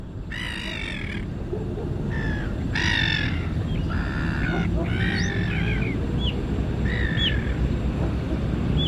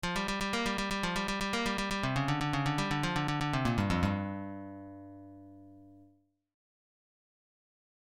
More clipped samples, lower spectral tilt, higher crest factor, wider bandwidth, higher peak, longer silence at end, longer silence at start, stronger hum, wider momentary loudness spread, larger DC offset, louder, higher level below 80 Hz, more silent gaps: neither; about the same, -6 dB/octave vs -5 dB/octave; about the same, 16 dB vs 18 dB; second, 11 kHz vs 16.5 kHz; first, -8 dBFS vs -16 dBFS; second, 0 s vs 2 s; about the same, 0 s vs 0.05 s; second, none vs 50 Hz at -55 dBFS; second, 7 LU vs 18 LU; neither; first, -26 LUFS vs -32 LUFS; first, -30 dBFS vs -50 dBFS; neither